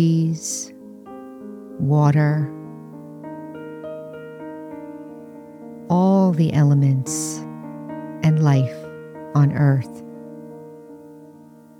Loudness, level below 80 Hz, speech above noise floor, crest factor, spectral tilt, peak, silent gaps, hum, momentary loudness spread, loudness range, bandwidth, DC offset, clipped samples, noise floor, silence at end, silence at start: -19 LUFS; -62 dBFS; 28 dB; 16 dB; -7 dB/octave; -6 dBFS; none; none; 23 LU; 8 LU; 13.5 kHz; under 0.1%; under 0.1%; -45 dBFS; 0.5 s; 0 s